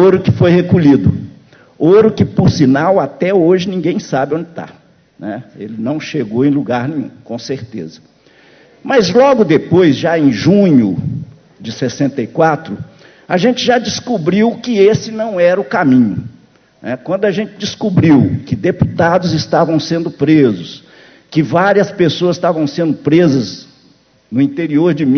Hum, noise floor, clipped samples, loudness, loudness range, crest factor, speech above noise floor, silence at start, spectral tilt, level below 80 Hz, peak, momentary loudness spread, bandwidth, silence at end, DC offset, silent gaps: none; -50 dBFS; under 0.1%; -13 LUFS; 7 LU; 12 dB; 38 dB; 0 s; -7 dB/octave; -42 dBFS; 0 dBFS; 16 LU; 6.6 kHz; 0 s; under 0.1%; none